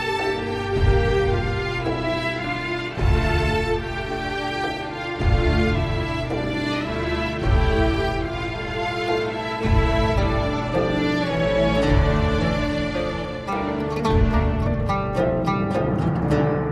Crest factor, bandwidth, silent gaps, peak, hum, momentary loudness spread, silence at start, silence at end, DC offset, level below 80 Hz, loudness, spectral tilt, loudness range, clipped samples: 16 dB; 12 kHz; none; -6 dBFS; none; 6 LU; 0 s; 0 s; under 0.1%; -28 dBFS; -22 LUFS; -7 dB/octave; 3 LU; under 0.1%